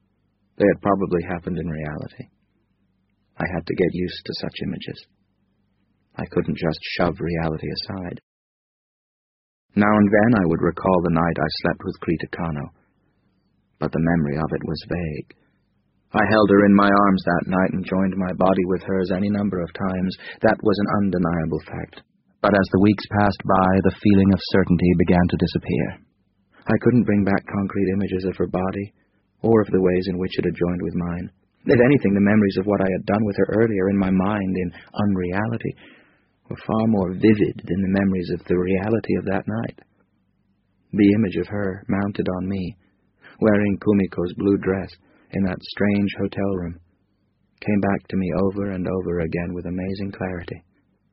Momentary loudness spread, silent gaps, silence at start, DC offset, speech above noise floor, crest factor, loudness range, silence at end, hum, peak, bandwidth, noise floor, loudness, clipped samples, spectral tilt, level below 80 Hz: 12 LU; 8.23-9.69 s; 0.6 s; under 0.1%; 47 dB; 20 dB; 8 LU; 0.55 s; none; -2 dBFS; 5.8 kHz; -67 dBFS; -21 LUFS; under 0.1%; -6.5 dB/octave; -46 dBFS